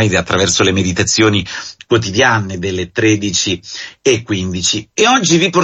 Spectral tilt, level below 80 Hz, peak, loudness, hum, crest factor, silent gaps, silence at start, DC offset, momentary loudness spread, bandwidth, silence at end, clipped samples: -3.5 dB/octave; -36 dBFS; 0 dBFS; -13 LUFS; none; 14 dB; none; 0 s; under 0.1%; 9 LU; 8.6 kHz; 0 s; under 0.1%